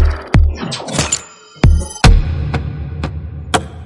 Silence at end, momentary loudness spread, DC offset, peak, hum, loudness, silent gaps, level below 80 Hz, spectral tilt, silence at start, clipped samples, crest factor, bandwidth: 0 s; 12 LU; under 0.1%; 0 dBFS; none; -16 LUFS; none; -18 dBFS; -4.5 dB/octave; 0 s; under 0.1%; 14 dB; 11.5 kHz